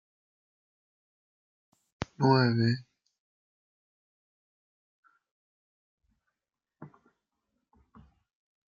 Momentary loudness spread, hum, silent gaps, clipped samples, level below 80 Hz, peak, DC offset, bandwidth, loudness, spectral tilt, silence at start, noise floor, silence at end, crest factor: 18 LU; none; 3.19-5.03 s, 5.31-5.98 s; under 0.1%; -68 dBFS; -10 dBFS; under 0.1%; 7.4 kHz; -27 LUFS; -7.5 dB/octave; 2 s; -90 dBFS; 1.8 s; 26 dB